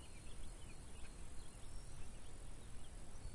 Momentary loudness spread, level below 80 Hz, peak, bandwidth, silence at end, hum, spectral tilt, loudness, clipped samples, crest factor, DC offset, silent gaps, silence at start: 1 LU; -54 dBFS; -36 dBFS; 11.5 kHz; 0 s; none; -4 dB/octave; -57 LUFS; under 0.1%; 12 dB; under 0.1%; none; 0 s